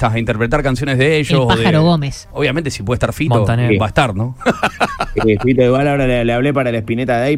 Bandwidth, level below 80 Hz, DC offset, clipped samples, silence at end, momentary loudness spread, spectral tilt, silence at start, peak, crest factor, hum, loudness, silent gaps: 14.5 kHz; -32 dBFS; under 0.1%; under 0.1%; 0 s; 6 LU; -6.5 dB/octave; 0 s; 0 dBFS; 14 dB; none; -15 LUFS; none